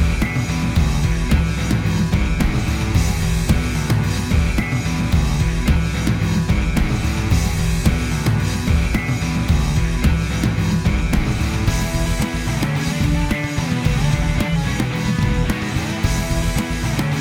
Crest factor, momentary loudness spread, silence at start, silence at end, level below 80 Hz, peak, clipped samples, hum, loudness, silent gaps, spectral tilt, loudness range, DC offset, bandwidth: 16 dB; 2 LU; 0 s; 0 s; -22 dBFS; -2 dBFS; under 0.1%; none; -19 LUFS; none; -5.5 dB/octave; 1 LU; under 0.1%; 17 kHz